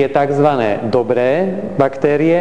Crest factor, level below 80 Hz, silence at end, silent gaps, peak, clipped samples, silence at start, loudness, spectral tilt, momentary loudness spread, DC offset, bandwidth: 14 dB; -52 dBFS; 0 s; none; 0 dBFS; under 0.1%; 0 s; -15 LUFS; -8 dB/octave; 4 LU; 1%; 10 kHz